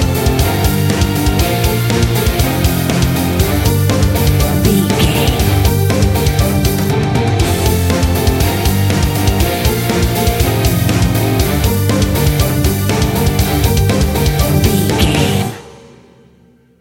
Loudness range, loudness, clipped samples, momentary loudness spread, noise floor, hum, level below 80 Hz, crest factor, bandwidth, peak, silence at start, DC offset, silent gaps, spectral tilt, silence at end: 1 LU; -13 LUFS; under 0.1%; 2 LU; -48 dBFS; none; -20 dBFS; 12 dB; 17 kHz; 0 dBFS; 0 s; under 0.1%; none; -5.5 dB/octave; 1 s